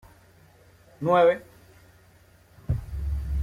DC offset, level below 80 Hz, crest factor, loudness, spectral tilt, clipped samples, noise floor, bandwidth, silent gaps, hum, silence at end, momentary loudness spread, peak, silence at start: under 0.1%; -38 dBFS; 20 dB; -25 LUFS; -8 dB/octave; under 0.1%; -56 dBFS; 14.5 kHz; none; none; 0 s; 13 LU; -8 dBFS; 1 s